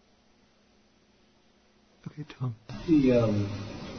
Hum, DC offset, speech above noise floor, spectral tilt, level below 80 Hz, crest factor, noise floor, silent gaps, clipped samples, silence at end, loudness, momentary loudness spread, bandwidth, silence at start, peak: none; under 0.1%; 37 dB; -8 dB/octave; -52 dBFS; 18 dB; -64 dBFS; none; under 0.1%; 0 s; -27 LUFS; 22 LU; 6.6 kHz; 2.05 s; -14 dBFS